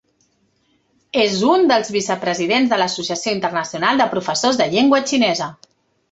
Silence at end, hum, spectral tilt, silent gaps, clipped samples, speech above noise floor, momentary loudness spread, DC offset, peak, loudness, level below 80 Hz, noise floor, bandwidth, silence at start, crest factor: 0.6 s; none; -3.5 dB/octave; none; under 0.1%; 46 dB; 7 LU; under 0.1%; -2 dBFS; -17 LUFS; -60 dBFS; -63 dBFS; 8.2 kHz; 1.15 s; 16 dB